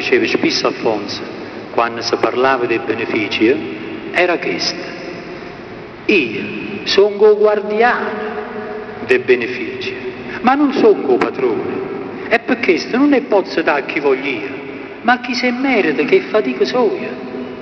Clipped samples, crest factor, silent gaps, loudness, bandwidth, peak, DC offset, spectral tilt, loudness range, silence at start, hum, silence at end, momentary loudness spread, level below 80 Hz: under 0.1%; 16 dB; none; -16 LUFS; 6.6 kHz; 0 dBFS; under 0.1%; -4.5 dB/octave; 3 LU; 0 s; none; 0 s; 13 LU; -54 dBFS